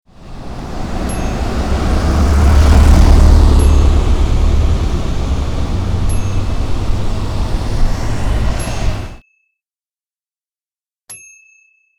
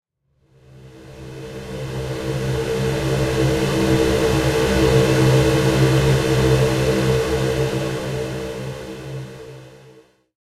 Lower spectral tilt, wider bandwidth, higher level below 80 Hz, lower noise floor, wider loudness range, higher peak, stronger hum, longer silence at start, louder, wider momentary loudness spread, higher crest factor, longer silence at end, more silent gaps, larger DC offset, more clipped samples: about the same, -6.5 dB/octave vs -6 dB/octave; second, 12 kHz vs 15.5 kHz; first, -14 dBFS vs -34 dBFS; first, under -90 dBFS vs -62 dBFS; first, 12 LU vs 8 LU; about the same, 0 dBFS vs -2 dBFS; neither; second, 0.2 s vs 0.75 s; first, -15 LUFS vs -19 LUFS; about the same, 17 LU vs 17 LU; second, 12 dB vs 18 dB; first, 0.8 s vs 0.6 s; neither; neither; neither